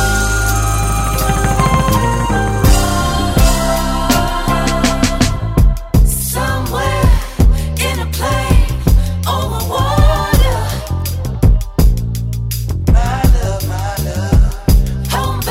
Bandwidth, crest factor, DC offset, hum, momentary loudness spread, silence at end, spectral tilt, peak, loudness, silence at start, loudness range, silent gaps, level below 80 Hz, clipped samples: 16.5 kHz; 12 dB; under 0.1%; none; 6 LU; 0 s; -5 dB/octave; 0 dBFS; -15 LUFS; 0 s; 2 LU; none; -16 dBFS; under 0.1%